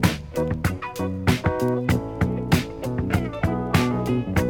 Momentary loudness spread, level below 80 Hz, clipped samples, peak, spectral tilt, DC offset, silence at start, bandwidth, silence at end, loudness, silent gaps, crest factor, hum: 5 LU; -40 dBFS; under 0.1%; -4 dBFS; -6.5 dB/octave; under 0.1%; 0 s; over 20 kHz; 0 s; -24 LUFS; none; 18 dB; none